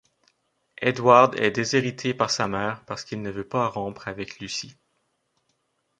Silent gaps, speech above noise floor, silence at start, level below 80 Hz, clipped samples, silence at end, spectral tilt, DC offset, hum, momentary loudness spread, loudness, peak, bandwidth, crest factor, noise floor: none; 49 dB; 0.8 s; -60 dBFS; under 0.1%; 1.3 s; -4.5 dB/octave; under 0.1%; none; 17 LU; -24 LUFS; -2 dBFS; 9.6 kHz; 22 dB; -73 dBFS